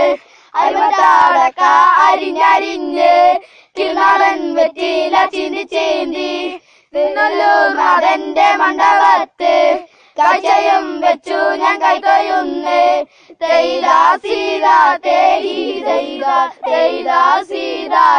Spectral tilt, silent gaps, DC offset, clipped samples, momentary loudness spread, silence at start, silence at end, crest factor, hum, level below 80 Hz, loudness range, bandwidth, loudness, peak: -2 dB/octave; none; under 0.1%; under 0.1%; 10 LU; 0 s; 0 s; 12 dB; none; -58 dBFS; 4 LU; 9.8 kHz; -13 LUFS; 0 dBFS